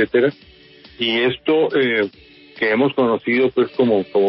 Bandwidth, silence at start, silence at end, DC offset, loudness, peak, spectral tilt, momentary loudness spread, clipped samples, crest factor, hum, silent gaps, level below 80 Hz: 5.8 kHz; 0 s; 0 s; under 0.1%; -18 LUFS; -4 dBFS; -3 dB/octave; 5 LU; under 0.1%; 14 dB; none; none; -58 dBFS